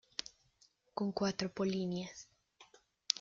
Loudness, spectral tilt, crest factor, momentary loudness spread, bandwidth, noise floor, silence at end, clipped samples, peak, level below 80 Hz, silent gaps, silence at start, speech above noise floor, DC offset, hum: -39 LUFS; -4.5 dB/octave; 34 dB; 18 LU; 7.4 kHz; -72 dBFS; 0 s; under 0.1%; -8 dBFS; -72 dBFS; none; 0.2 s; 35 dB; under 0.1%; none